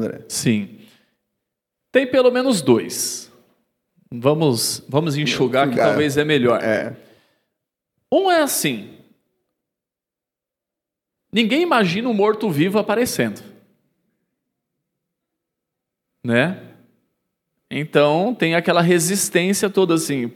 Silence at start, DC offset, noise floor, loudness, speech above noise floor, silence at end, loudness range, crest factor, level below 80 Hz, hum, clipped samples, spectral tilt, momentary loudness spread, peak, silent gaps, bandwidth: 0 s; under 0.1%; -87 dBFS; -18 LUFS; 69 dB; 0 s; 9 LU; 20 dB; -66 dBFS; none; under 0.1%; -4.5 dB/octave; 8 LU; 0 dBFS; none; 18 kHz